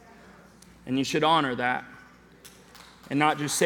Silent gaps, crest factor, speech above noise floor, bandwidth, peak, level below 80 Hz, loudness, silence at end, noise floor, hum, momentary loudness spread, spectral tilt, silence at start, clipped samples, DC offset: none; 22 dB; 27 dB; 19 kHz; -8 dBFS; -62 dBFS; -26 LUFS; 0 s; -52 dBFS; none; 13 LU; -3.5 dB/octave; 0.85 s; under 0.1%; under 0.1%